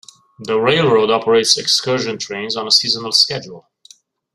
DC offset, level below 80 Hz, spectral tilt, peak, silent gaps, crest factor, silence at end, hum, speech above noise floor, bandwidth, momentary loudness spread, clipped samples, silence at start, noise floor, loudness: under 0.1%; -60 dBFS; -2.5 dB/octave; 0 dBFS; none; 18 dB; 0.75 s; none; 32 dB; 14.5 kHz; 10 LU; under 0.1%; 0.4 s; -48 dBFS; -14 LUFS